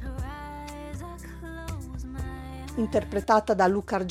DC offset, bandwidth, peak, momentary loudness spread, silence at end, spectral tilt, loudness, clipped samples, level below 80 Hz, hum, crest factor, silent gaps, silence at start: under 0.1%; 16 kHz; -6 dBFS; 16 LU; 0 s; -6.5 dB/octave; -29 LUFS; under 0.1%; -40 dBFS; none; 22 dB; none; 0 s